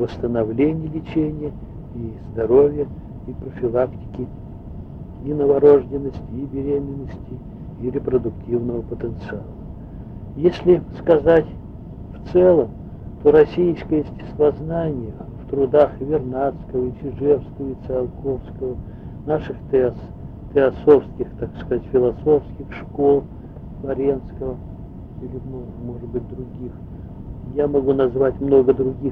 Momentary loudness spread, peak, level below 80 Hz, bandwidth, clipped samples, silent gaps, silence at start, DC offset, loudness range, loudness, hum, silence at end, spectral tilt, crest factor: 20 LU; -2 dBFS; -38 dBFS; 5.2 kHz; under 0.1%; none; 0 s; under 0.1%; 7 LU; -20 LUFS; none; 0 s; -10 dB/octave; 18 dB